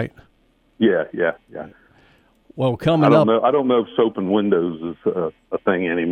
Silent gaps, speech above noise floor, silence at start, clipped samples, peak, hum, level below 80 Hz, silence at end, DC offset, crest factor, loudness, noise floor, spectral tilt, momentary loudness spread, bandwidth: none; 41 dB; 0 s; under 0.1%; -2 dBFS; none; -58 dBFS; 0 s; under 0.1%; 16 dB; -19 LUFS; -60 dBFS; -8.5 dB/octave; 13 LU; 9.4 kHz